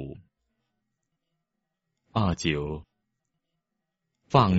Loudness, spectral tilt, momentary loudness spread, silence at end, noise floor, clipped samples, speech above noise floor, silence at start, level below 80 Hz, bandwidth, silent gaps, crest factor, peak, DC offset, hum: -27 LUFS; -5.5 dB/octave; 16 LU; 0 s; -83 dBFS; under 0.1%; 59 dB; 0 s; -50 dBFS; 7.6 kHz; none; 24 dB; -6 dBFS; under 0.1%; none